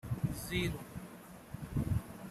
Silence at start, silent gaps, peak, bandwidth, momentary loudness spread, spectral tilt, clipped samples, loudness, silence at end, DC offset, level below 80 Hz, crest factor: 0.05 s; none; -22 dBFS; 15.5 kHz; 14 LU; -5.5 dB/octave; under 0.1%; -39 LUFS; 0 s; under 0.1%; -50 dBFS; 18 dB